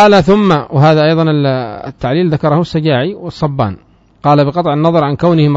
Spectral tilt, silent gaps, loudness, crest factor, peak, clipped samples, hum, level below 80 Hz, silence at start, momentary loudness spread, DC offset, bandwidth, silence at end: -8 dB/octave; none; -12 LUFS; 10 dB; 0 dBFS; 0.3%; none; -40 dBFS; 0 s; 10 LU; under 0.1%; 7.8 kHz; 0 s